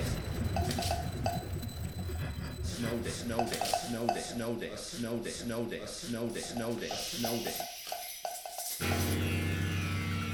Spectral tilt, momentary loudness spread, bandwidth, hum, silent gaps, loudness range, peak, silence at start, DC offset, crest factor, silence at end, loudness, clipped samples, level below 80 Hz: -4.5 dB/octave; 7 LU; over 20 kHz; none; none; 2 LU; -14 dBFS; 0 s; under 0.1%; 20 dB; 0 s; -35 LUFS; under 0.1%; -48 dBFS